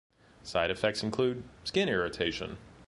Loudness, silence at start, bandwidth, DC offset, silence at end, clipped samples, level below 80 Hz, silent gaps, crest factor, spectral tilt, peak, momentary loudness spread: -31 LUFS; 0.45 s; 11.5 kHz; under 0.1%; 0.05 s; under 0.1%; -56 dBFS; none; 20 dB; -4.5 dB/octave; -12 dBFS; 10 LU